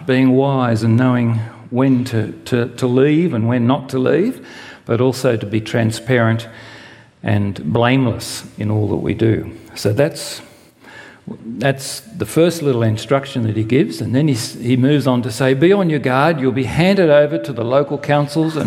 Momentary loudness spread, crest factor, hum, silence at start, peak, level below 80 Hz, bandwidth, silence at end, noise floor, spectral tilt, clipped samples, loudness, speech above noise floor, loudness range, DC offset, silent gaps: 11 LU; 16 dB; none; 0 s; 0 dBFS; -50 dBFS; 16 kHz; 0 s; -41 dBFS; -6.5 dB/octave; under 0.1%; -16 LUFS; 26 dB; 6 LU; under 0.1%; none